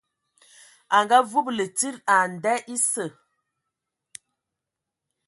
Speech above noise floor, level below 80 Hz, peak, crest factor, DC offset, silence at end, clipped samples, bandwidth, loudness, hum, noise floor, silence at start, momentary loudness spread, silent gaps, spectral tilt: 63 dB; -78 dBFS; -4 dBFS; 24 dB; under 0.1%; 2.2 s; under 0.1%; 12 kHz; -22 LUFS; none; -86 dBFS; 0.9 s; 8 LU; none; -2 dB/octave